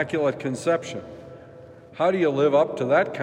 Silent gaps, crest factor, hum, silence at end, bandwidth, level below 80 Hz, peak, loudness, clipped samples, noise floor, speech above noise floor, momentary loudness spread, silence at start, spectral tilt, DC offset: none; 16 dB; none; 0 s; 11 kHz; -68 dBFS; -8 dBFS; -23 LUFS; under 0.1%; -45 dBFS; 23 dB; 22 LU; 0 s; -6 dB/octave; under 0.1%